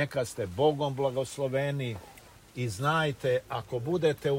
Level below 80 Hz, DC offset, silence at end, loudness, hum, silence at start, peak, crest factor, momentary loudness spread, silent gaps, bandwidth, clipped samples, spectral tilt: -60 dBFS; under 0.1%; 0 s; -30 LUFS; none; 0 s; -12 dBFS; 16 dB; 9 LU; none; 16 kHz; under 0.1%; -5.5 dB/octave